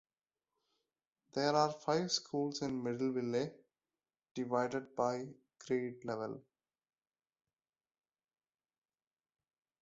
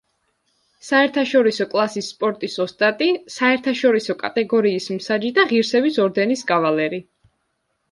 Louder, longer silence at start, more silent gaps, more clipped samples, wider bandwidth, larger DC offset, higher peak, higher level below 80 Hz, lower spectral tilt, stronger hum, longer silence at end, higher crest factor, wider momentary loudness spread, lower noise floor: second, -37 LUFS vs -19 LUFS; first, 1.35 s vs 0.85 s; first, 4.31-4.35 s vs none; neither; second, 7.6 kHz vs 11.5 kHz; neither; second, -18 dBFS vs -4 dBFS; second, -80 dBFS vs -68 dBFS; about the same, -4 dB/octave vs -4.5 dB/octave; neither; first, 3.4 s vs 0.9 s; first, 22 dB vs 16 dB; first, 11 LU vs 7 LU; first, under -90 dBFS vs -71 dBFS